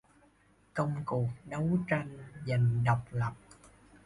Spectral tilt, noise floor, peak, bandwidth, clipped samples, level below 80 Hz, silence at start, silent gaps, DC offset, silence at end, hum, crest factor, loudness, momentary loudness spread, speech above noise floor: -8.5 dB/octave; -66 dBFS; -16 dBFS; 11 kHz; under 0.1%; -58 dBFS; 0.75 s; none; under 0.1%; 0.7 s; none; 18 dB; -33 LUFS; 13 LU; 34 dB